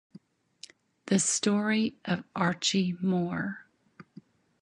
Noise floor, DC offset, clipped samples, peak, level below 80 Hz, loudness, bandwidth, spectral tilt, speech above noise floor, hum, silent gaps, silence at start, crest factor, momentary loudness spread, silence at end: -56 dBFS; under 0.1%; under 0.1%; -12 dBFS; -70 dBFS; -28 LUFS; 11 kHz; -4 dB/octave; 28 dB; none; none; 1.05 s; 20 dB; 24 LU; 0.6 s